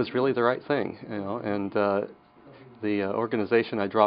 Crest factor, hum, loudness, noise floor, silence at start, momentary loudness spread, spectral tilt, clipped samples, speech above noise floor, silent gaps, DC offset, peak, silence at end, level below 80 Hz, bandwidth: 20 dB; none; -27 LUFS; -51 dBFS; 0 s; 9 LU; -4.5 dB/octave; under 0.1%; 25 dB; none; under 0.1%; -6 dBFS; 0 s; -72 dBFS; 5.4 kHz